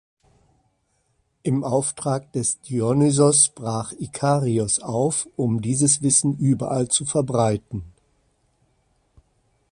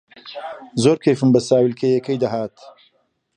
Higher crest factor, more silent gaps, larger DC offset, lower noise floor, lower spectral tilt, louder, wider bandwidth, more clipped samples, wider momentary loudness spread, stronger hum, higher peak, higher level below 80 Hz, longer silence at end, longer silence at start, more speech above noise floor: first, 22 dB vs 16 dB; neither; neither; first, -69 dBFS vs -64 dBFS; second, -5 dB/octave vs -6.5 dB/octave; second, -21 LUFS vs -18 LUFS; about the same, 11.5 kHz vs 11.5 kHz; neither; second, 12 LU vs 17 LU; neither; about the same, -2 dBFS vs -2 dBFS; first, -54 dBFS vs -60 dBFS; first, 1.85 s vs 0.65 s; first, 1.45 s vs 0.25 s; about the same, 48 dB vs 46 dB